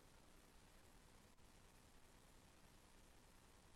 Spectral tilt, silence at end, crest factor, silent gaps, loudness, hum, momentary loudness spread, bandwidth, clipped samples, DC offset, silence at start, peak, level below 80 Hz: -3.5 dB/octave; 0 s; 12 dB; none; -69 LUFS; none; 1 LU; 13 kHz; under 0.1%; under 0.1%; 0 s; -56 dBFS; -72 dBFS